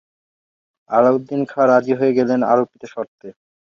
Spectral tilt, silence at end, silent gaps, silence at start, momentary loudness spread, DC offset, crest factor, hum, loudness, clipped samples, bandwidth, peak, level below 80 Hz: -8 dB/octave; 0.35 s; 3.08-3.18 s; 0.9 s; 15 LU; under 0.1%; 18 dB; none; -17 LUFS; under 0.1%; 7 kHz; 0 dBFS; -66 dBFS